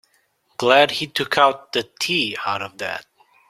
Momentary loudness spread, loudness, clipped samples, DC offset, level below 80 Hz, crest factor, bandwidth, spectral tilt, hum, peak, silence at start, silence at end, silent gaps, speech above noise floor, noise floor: 13 LU; -19 LUFS; under 0.1%; under 0.1%; -64 dBFS; 20 dB; 16 kHz; -3 dB/octave; none; 0 dBFS; 0.6 s; 0.5 s; none; 44 dB; -64 dBFS